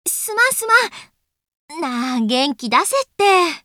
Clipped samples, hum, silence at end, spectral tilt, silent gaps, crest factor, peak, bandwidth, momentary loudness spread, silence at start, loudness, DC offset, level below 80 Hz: under 0.1%; none; 0.05 s; -1.5 dB/octave; 1.55-1.68 s; 18 dB; 0 dBFS; over 20 kHz; 11 LU; 0.05 s; -17 LUFS; under 0.1%; -68 dBFS